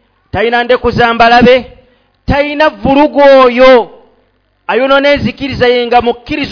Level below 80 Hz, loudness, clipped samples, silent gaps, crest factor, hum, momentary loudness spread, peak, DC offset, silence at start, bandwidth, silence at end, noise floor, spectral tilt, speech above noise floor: -32 dBFS; -8 LUFS; 4%; none; 8 dB; none; 11 LU; 0 dBFS; under 0.1%; 0.35 s; 5.4 kHz; 0 s; -54 dBFS; -6.5 dB/octave; 47 dB